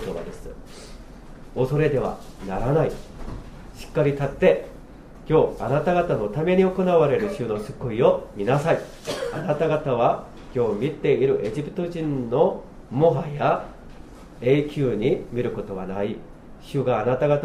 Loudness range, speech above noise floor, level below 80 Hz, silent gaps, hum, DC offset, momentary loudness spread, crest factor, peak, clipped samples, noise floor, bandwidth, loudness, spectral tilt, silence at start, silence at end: 4 LU; 20 dB; -42 dBFS; none; none; under 0.1%; 17 LU; 18 dB; -4 dBFS; under 0.1%; -42 dBFS; 13.5 kHz; -23 LUFS; -7.5 dB/octave; 0 s; 0 s